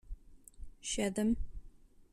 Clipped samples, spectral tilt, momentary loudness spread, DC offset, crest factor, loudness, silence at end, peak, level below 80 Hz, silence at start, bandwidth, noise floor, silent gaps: under 0.1%; -4 dB/octave; 24 LU; under 0.1%; 18 dB; -36 LUFS; 0.1 s; -20 dBFS; -48 dBFS; 0.05 s; 13.5 kHz; -56 dBFS; none